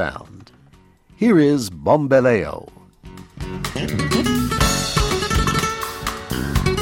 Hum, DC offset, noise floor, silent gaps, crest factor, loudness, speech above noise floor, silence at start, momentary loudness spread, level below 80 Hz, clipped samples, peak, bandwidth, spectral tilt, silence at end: none; under 0.1%; -51 dBFS; none; 18 dB; -19 LUFS; 34 dB; 0 s; 14 LU; -32 dBFS; under 0.1%; -2 dBFS; 17 kHz; -5 dB/octave; 0 s